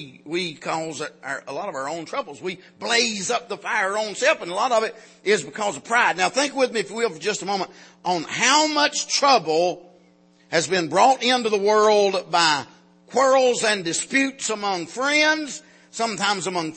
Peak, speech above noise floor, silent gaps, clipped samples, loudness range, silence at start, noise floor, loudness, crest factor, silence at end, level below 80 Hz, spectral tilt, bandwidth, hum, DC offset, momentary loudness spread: -4 dBFS; 34 dB; none; under 0.1%; 4 LU; 0 s; -56 dBFS; -21 LUFS; 18 dB; 0 s; -76 dBFS; -2 dB/octave; 8.8 kHz; none; under 0.1%; 13 LU